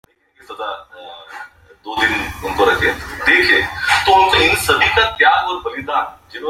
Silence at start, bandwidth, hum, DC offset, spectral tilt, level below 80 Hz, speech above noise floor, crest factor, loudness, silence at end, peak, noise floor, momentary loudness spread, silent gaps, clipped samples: 0.5 s; 16.5 kHz; none; under 0.1%; -3 dB/octave; -40 dBFS; 21 dB; 16 dB; -14 LUFS; 0 s; 0 dBFS; -37 dBFS; 19 LU; none; under 0.1%